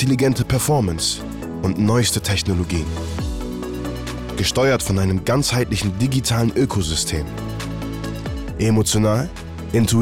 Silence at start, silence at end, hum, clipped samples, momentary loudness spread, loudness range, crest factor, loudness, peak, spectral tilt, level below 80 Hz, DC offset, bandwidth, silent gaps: 0 s; 0 s; none; under 0.1%; 10 LU; 2 LU; 10 dB; -20 LUFS; -8 dBFS; -5 dB/octave; -34 dBFS; under 0.1%; 17 kHz; none